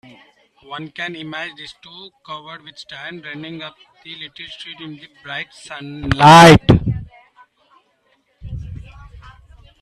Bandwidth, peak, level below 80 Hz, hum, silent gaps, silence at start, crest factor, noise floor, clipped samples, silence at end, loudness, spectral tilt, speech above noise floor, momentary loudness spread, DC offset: 14 kHz; 0 dBFS; -38 dBFS; none; none; 0.7 s; 18 dB; -62 dBFS; under 0.1%; 1.05 s; -11 LUFS; -5.5 dB/octave; 46 dB; 28 LU; under 0.1%